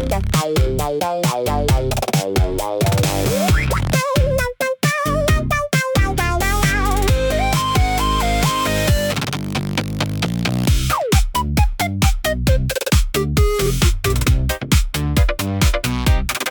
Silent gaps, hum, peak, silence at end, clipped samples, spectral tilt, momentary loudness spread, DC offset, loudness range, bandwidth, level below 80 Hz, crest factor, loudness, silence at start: none; none; -4 dBFS; 0 s; under 0.1%; -5 dB/octave; 3 LU; under 0.1%; 1 LU; 19 kHz; -22 dBFS; 14 dB; -18 LUFS; 0 s